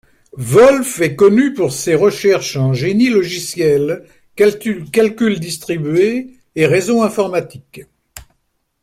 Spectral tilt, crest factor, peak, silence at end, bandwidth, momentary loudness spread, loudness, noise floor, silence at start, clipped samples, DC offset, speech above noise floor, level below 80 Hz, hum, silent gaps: -5.5 dB/octave; 14 dB; 0 dBFS; 0.65 s; 16 kHz; 11 LU; -14 LUFS; -66 dBFS; 0.35 s; under 0.1%; under 0.1%; 52 dB; -50 dBFS; none; none